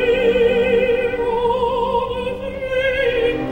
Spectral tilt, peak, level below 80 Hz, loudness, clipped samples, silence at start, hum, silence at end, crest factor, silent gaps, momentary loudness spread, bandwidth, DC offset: -6 dB/octave; -6 dBFS; -38 dBFS; -18 LUFS; under 0.1%; 0 s; 60 Hz at -40 dBFS; 0 s; 12 dB; none; 8 LU; 9.2 kHz; under 0.1%